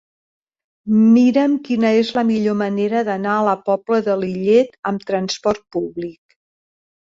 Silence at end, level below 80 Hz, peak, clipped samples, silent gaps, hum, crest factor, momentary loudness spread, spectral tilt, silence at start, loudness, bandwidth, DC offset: 0.9 s; -60 dBFS; -4 dBFS; under 0.1%; 4.79-4.83 s; none; 14 dB; 12 LU; -6.5 dB/octave; 0.85 s; -17 LUFS; 7.6 kHz; under 0.1%